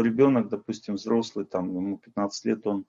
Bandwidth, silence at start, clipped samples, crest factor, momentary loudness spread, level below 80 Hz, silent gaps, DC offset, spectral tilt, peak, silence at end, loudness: 7.6 kHz; 0 s; under 0.1%; 18 dB; 11 LU; -72 dBFS; none; under 0.1%; -6.5 dB/octave; -8 dBFS; 0.05 s; -27 LUFS